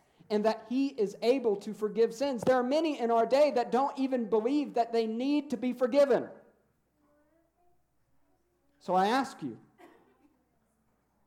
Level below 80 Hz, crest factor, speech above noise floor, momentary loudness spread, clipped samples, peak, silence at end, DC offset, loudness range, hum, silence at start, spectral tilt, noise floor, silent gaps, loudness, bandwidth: -78 dBFS; 16 dB; 45 dB; 8 LU; under 0.1%; -14 dBFS; 1.4 s; under 0.1%; 7 LU; none; 0.3 s; -5.5 dB/octave; -73 dBFS; none; -29 LUFS; 15 kHz